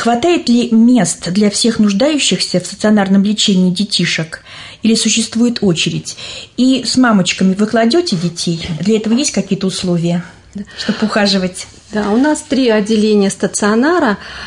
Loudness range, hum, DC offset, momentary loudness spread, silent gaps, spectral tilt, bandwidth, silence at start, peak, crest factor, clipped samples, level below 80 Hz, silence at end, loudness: 4 LU; none; under 0.1%; 10 LU; none; -4.5 dB/octave; 11 kHz; 0 s; -2 dBFS; 12 dB; under 0.1%; -48 dBFS; 0 s; -13 LUFS